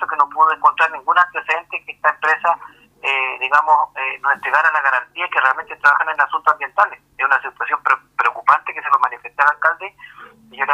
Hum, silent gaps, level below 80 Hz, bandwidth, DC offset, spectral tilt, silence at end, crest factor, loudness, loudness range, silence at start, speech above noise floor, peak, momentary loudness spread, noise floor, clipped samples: none; none; -66 dBFS; 11 kHz; under 0.1%; -1.5 dB/octave; 0 s; 18 dB; -17 LUFS; 2 LU; 0 s; 25 dB; 0 dBFS; 7 LU; -42 dBFS; under 0.1%